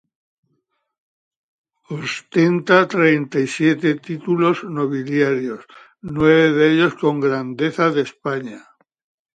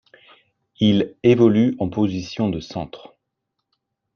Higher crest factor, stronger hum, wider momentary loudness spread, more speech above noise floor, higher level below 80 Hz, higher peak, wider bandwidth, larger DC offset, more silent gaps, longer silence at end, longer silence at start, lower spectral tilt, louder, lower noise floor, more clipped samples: about the same, 18 dB vs 18 dB; neither; about the same, 14 LU vs 15 LU; second, 53 dB vs 60 dB; about the same, -56 dBFS vs -54 dBFS; about the same, 0 dBFS vs -2 dBFS; first, 9.2 kHz vs 6.8 kHz; neither; neither; second, 0.75 s vs 1.2 s; first, 1.9 s vs 0.8 s; about the same, -6.5 dB/octave vs -7.5 dB/octave; about the same, -18 LUFS vs -19 LUFS; second, -70 dBFS vs -78 dBFS; neither